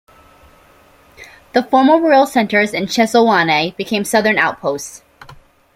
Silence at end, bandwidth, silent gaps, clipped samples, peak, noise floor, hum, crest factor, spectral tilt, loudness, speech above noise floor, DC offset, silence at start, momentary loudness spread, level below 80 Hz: 0.4 s; 16.5 kHz; none; under 0.1%; -2 dBFS; -48 dBFS; none; 14 dB; -4 dB/octave; -14 LUFS; 34 dB; under 0.1%; 1.2 s; 10 LU; -54 dBFS